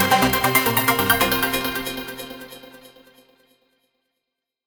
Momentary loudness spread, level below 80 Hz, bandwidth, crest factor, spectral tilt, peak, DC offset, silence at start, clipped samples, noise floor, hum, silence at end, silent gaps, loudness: 20 LU; -46 dBFS; over 20 kHz; 22 dB; -3 dB/octave; -2 dBFS; under 0.1%; 0 s; under 0.1%; -82 dBFS; none; 1.8 s; none; -19 LUFS